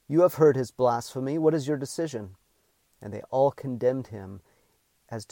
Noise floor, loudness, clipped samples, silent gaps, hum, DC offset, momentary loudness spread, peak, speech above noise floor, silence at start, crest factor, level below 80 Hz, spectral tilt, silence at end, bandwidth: -69 dBFS; -26 LUFS; under 0.1%; none; none; under 0.1%; 19 LU; -10 dBFS; 44 dB; 0.1 s; 18 dB; -68 dBFS; -7 dB/octave; 0.05 s; 17.5 kHz